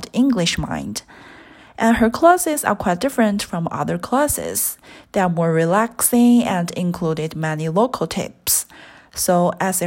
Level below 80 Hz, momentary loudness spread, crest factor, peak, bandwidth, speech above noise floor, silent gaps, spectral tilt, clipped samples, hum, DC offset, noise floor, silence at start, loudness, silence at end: -46 dBFS; 10 LU; 18 dB; 0 dBFS; 16.5 kHz; 26 dB; none; -4.5 dB/octave; under 0.1%; none; under 0.1%; -44 dBFS; 0 s; -18 LUFS; 0 s